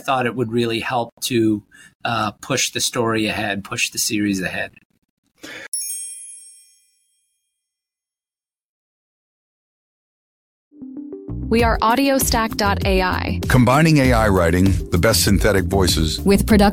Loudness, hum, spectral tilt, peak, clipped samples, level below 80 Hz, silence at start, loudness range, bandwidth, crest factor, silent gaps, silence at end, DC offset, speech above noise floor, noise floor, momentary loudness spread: -18 LUFS; none; -4.5 dB/octave; -2 dBFS; under 0.1%; -32 dBFS; 0.05 s; 16 LU; 17 kHz; 18 dB; 1.12-1.17 s, 1.95-2.00 s, 4.85-4.90 s, 4.98-5.02 s, 5.10-5.23 s, 5.68-5.72 s, 8.65-10.71 s; 0 s; under 0.1%; over 73 dB; under -90 dBFS; 16 LU